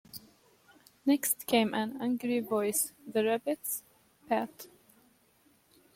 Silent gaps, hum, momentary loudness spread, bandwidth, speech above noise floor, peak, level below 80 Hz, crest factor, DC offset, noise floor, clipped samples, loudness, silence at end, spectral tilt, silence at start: none; none; 15 LU; 16.5 kHz; 36 dB; -12 dBFS; -76 dBFS; 20 dB; under 0.1%; -67 dBFS; under 0.1%; -31 LUFS; 1.3 s; -3 dB/octave; 0.15 s